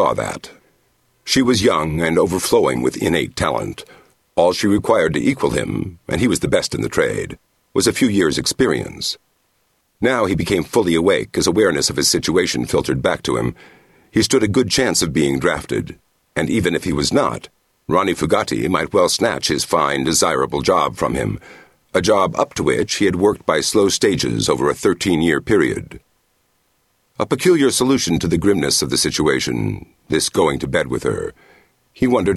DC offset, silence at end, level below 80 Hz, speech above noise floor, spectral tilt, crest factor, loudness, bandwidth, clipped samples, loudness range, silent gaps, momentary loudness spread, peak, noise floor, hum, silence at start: under 0.1%; 0 s; -42 dBFS; 47 dB; -4 dB/octave; 18 dB; -17 LUFS; 13 kHz; under 0.1%; 3 LU; none; 9 LU; 0 dBFS; -64 dBFS; none; 0 s